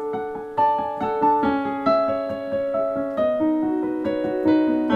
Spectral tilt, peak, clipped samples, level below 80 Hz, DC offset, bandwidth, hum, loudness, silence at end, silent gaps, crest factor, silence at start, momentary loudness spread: -8 dB/octave; -6 dBFS; under 0.1%; -56 dBFS; under 0.1%; 5.2 kHz; none; -22 LUFS; 0 s; none; 14 dB; 0 s; 7 LU